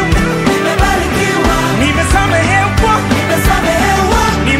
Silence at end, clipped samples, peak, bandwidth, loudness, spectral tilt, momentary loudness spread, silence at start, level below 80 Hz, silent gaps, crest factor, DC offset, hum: 0 s; under 0.1%; 0 dBFS; 16.5 kHz; -11 LUFS; -4.5 dB/octave; 2 LU; 0 s; -20 dBFS; none; 12 dB; under 0.1%; none